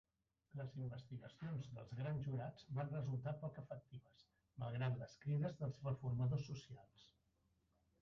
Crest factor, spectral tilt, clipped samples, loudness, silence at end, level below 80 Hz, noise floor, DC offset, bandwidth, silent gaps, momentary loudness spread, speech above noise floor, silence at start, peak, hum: 16 dB; -8 dB/octave; under 0.1%; -47 LUFS; 0.95 s; -72 dBFS; -82 dBFS; under 0.1%; 7 kHz; none; 13 LU; 36 dB; 0.55 s; -32 dBFS; none